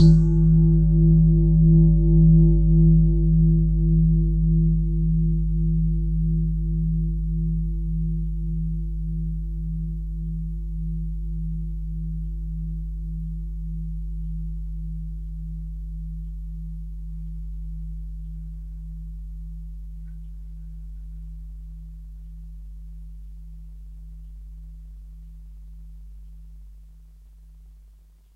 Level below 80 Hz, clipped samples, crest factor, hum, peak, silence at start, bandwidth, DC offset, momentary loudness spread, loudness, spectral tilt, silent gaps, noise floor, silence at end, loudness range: -26 dBFS; under 0.1%; 18 dB; none; -4 dBFS; 0 s; 4.4 kHz; under 0.1%; 25 LU; -22 LUFS; -11.5 dB/octave; none; -51 dBFS; 0.6 s; 25 LU